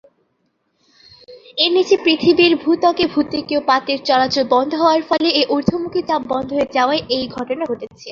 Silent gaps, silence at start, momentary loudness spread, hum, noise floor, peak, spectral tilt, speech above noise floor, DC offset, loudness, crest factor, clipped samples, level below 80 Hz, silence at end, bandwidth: none; 1.3 s; 9 LU; none; -67 dBFS; -2 dBFS; -5 dB/octave; 50 dB; under 0.1%; -16 LUFS; 16 dB; under 0.1%; -54 dBFS; 0 s; 7.2 kHz